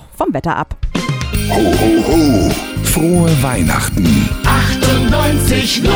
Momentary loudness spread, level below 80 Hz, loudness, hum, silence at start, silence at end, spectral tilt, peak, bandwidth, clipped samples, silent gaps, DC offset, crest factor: 7 LU; -22 dBFS; -13 LUFS; none; 0.1 s; 0 s; -5 dB/octave; -2 dBFS; over 20 kHz; under 0.1%; none; under 0.1%; 12 dB